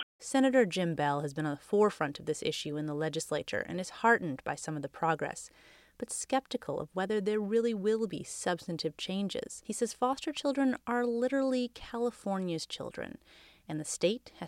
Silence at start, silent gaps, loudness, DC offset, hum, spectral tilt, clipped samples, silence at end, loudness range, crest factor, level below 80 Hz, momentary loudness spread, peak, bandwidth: 0 s; 0.03-0.19 s; -33 LUFS; under 0.1%; none; -4.5 dB/octave; under 0.1%; 0 s; 3 LU; 20 dB; -68 dBFS; 11 LU; -12 dBFS; 16 kHz